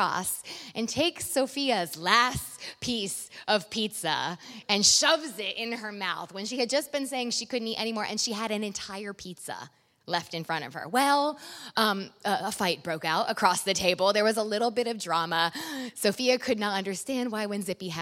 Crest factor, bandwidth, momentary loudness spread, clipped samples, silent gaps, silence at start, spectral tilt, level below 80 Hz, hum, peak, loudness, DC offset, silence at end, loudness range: 24 dB; 16.5 kHz; 11 LU; under 0.1%; none; 0 s; -2.5 dB/octave; -62 dBFS; none; -4 dBFS; -28 LUFS; under 0.1%; 0 s; 5 LU